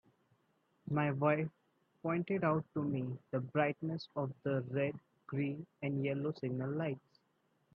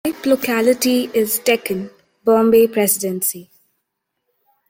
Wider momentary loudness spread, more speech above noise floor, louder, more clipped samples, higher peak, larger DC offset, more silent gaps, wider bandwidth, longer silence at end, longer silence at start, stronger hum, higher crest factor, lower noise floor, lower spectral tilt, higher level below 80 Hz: second, 8 LU vs 11 LU; second, 41 dB vs 59 dB; second, -37 LUFS vs -17 LUFS; neither; second, -18 dBFS vs -2 dBFS; neither; neither; second, 5.8 kHz vs 17 kHz; second, 0.75 s vs 1.25 s; first, 0.85 s vs 0.05 s; neither; about the same, 20 dB vs 16 dB; about the same, -77 dBFS vs -75 dBFS; first, -10 dB/octave vs -3.5 dB/octave; second, -78 dBFS vs -62 dBFS